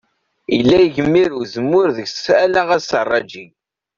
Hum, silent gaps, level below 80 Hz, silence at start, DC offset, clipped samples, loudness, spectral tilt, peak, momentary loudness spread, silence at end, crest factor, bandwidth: none; none; -48 dBFS; 0.5 s; under 0.1%; under 0.1%; -15 LUFS; -5.5 dB/octave; -2 dBFS; 10 LU; 0.55 s; 14 dB; 7.4 kHz